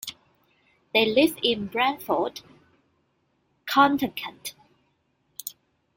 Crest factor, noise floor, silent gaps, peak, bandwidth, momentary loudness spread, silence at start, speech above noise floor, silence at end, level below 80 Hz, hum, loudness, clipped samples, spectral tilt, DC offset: 24 dB; -70 dBFS; none; -4 dBFS; 17 kHz; 19 LU; 0.05 s; 47 dB; 0.45 s; -66 dBFS; none; -23 LUFS; under 0.1%; -3.5 dB/octave; under 0.1%